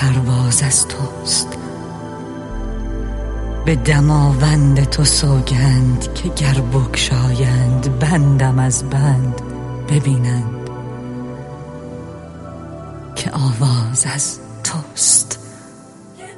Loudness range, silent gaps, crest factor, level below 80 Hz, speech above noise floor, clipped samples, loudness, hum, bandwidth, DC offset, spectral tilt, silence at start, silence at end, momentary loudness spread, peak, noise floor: 8 LU; none; 16 dB; -28 dBFS; 25 dB; under 0.1%; -16 LUFS; none; 11.5 kHz; under 0.1%; -4.5 dB/octave; 0 s; 0 s; 17 LU; 0 dBFS; -39 dBFS